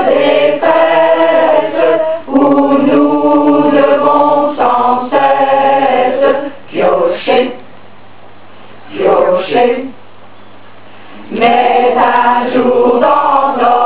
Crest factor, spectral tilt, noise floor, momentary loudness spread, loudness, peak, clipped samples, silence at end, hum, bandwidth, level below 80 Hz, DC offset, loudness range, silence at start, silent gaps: 10 dB; -9 dB/octave; -38 dBFS; 5 LU; -10 LUFS; 0 dBFS; under 0.1%; 0 s; none; 4 kHz; -54 dBFS; 3%; 6 LU; 0 s; none